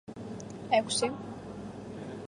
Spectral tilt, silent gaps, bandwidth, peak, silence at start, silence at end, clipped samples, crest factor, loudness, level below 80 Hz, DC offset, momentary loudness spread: -3.5 dB/octave; none; 11.5 kHz; -12 dBFS; 0.05 s; 0 s; under 0.1%; 22 dB; -33 LUFS; -62 dBFS; under 0.1%; 15 LU